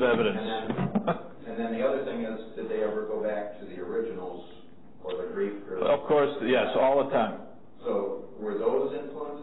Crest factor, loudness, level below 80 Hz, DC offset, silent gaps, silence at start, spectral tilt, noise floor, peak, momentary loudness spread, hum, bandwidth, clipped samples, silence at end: 14 dB; -29 LUFS; -62 dBFS; 0.6%; none; 0 s; -10 dB/octave; -52 dBFS; -14 dBFS; 14 LU; none; 4.1 kHz; under 0.1%; 0 s